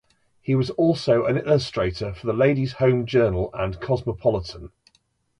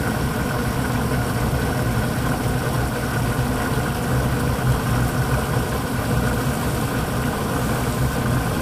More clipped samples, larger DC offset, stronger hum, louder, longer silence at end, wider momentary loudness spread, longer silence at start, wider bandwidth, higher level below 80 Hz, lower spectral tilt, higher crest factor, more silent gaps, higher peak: neither; second, under 0.1% vs 0.2%; neither; about the same, -22 LUFS vs -22 LUFS; first, 0.75 s vs 0 s; first, 9 LU vs 2 LU; first, 0.45 s vs 0 s; second, 10.5 kHz vs 16 kHz; second, -44 dBFS vs -30 dBFS; first, -7.5 dB/octave vs -5.5 dB/octave; about the same, 16 dB vs 14 dB; neither; about the same, -6 dBFS vs -8 dBFS